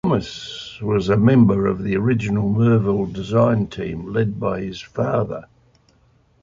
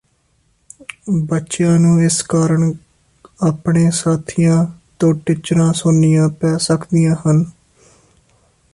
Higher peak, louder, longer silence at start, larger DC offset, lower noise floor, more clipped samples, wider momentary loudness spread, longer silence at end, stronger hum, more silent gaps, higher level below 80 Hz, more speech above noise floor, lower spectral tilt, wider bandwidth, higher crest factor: about the same, -2 dBFS vs -4 dBFS; second, -19 LUFS vs -15 LUFS; second, 0.05 s vs 1.05 s; neither; about the same, -57 dBFS vs -60 dBFS; neither; first, 13 LU vs 8 LU; second, 1 s vs 1.25 s; neither; neither; first, -44 dBFS vs -50 dBFS; second, 39 dB vs 46 dB; first, -8 dB/octave vs -6.5 dB/octave; second, 7.4 kHz vs 11.5 kHz; about the same, 16 dB vs 12 dB